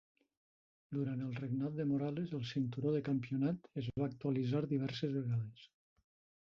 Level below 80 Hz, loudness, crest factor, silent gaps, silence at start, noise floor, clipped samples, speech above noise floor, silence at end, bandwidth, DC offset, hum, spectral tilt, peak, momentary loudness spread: -70 dBFS; -38 LUFS; 16 dB; none; 0.9 s; under -90 dBFS; under 0.1%; over 52 dB; 0.85 s; 7 kHz; under 0.1%; none; -7.5 dB/octave; -24 dBFS; 5 LU